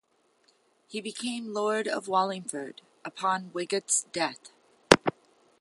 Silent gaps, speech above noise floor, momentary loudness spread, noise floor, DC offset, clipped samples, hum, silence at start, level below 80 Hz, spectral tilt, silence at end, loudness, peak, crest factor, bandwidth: none; 37 dB; 17 LU; -67 dBFS; under 0.1%; under 0.1%; none; 0.9 s; -60 dBFS; -2.5 dB/octave; 0.5 s; -28 LUFS; 0 dBFS; 30 dB; 12 kHz